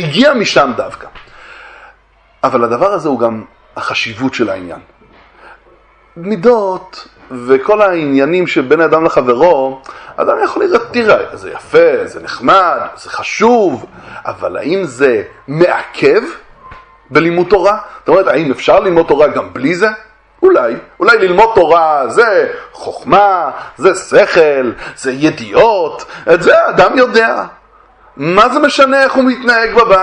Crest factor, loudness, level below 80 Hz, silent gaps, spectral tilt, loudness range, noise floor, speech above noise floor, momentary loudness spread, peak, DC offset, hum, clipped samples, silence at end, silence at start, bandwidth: 12 dB; -11 LUFS; -46 dBFS; none; -5 dB/octave; 6 LU; -48 dBFS; 38 dB; 14 LU; 0 dBFS; under 0.1%; none; 0.4%; 0 s; 0 s; 10.5 kHz